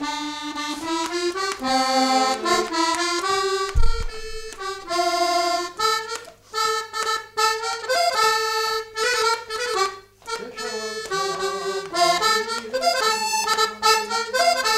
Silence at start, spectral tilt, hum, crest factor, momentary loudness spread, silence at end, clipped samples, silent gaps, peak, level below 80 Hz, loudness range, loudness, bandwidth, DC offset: 0 s; -2 dB/octave; none; 18 dB; 11 LU; 0 s; under 0.1%; none; -4 dBFS; -34 dBFS; 3 LU; -22 LUFS; 16 kHz; under 0.1%